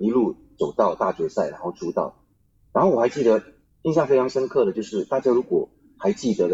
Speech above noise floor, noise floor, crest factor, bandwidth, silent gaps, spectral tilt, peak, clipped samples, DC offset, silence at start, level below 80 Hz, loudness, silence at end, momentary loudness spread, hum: 39 dB; -61 dBFS; 16 dB; 7.8 kHz; none; -7 dB/octave; -6 dBFS; under 0.1%; under 0.1%; 0 s; -60 dBFS; -23 LUFS; 0 s; 8 LU; none